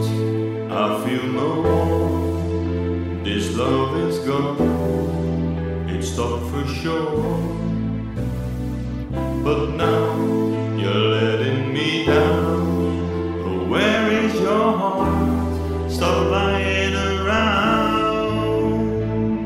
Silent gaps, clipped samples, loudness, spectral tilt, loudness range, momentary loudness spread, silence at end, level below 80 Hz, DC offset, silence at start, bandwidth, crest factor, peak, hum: none; under 0.1%; -21 LUFS; -6.5 dB/octave; 4 LU; 7 LU; 0 s; -34 dBFS; under 0.1%; 0 s; 15.5 kHz; 16 dB; -4 dBFS; none